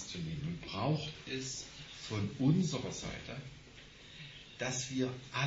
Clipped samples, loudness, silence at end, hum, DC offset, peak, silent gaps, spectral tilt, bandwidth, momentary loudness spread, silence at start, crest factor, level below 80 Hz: under 0.1%; -37 LUFS; 0 s; none; under 0.1%; -18 dBFS; none; -5 dB/octave; 8 kHz; 18 LU; 0 s; 20 dB; -60 dBFS